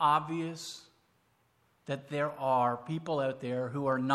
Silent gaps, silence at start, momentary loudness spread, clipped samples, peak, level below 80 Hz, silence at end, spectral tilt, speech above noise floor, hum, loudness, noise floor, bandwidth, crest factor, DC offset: none; 0 s; 13 LU; under 0.1%; -12 dBFS; -78 dBFS; 0 s; -6 dB/octave; 40 dB; none; -33 LUFS; -71 dBFS; 14.5 kHz; 20 dB; under 0.1%